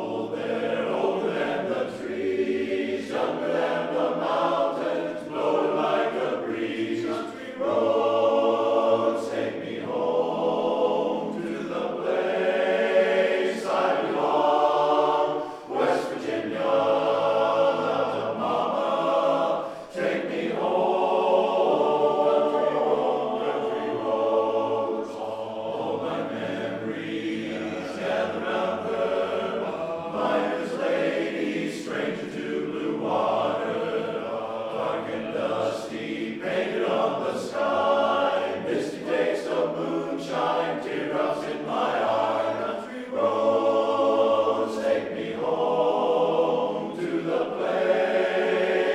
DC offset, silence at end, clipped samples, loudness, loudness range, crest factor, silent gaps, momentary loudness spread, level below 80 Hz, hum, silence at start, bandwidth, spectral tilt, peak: under 0.1%; 0 s; under 0.1%; -25 LUFS; 5 LU; 16 dB; none; 8 LU; -68 dBFS; none; 0 s; 11.5 kHz; -5.5 dB/octave; -8 dBFS